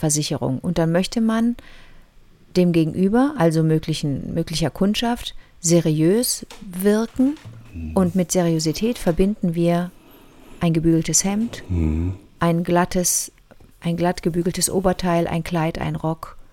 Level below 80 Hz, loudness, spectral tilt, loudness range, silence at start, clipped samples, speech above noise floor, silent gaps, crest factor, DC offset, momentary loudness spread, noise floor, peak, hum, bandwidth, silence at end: -40 dBFS; -20 LUFS; -5 dB/octave; 2 LU; 0 s; under 0.1%; 29 dB; none; 16 dB; under 0.1%; 8 LU; -49 dBFS; -4 dBFS; none; 17 kHz; 0.1 s